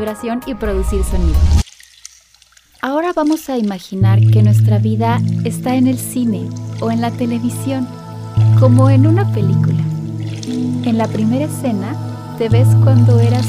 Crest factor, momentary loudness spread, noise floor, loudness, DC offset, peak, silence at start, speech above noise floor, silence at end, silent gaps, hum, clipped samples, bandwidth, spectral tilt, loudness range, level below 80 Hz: 14 dB; 12 LU; -49 dBFS; -15 LUFS; under 0.1%; 0 dBFS; 0 s; 36 dB; 0 s; none; none; under 0.1%; 15 kHz; -7.5 dB/octave; 4 LU; -26 dBFS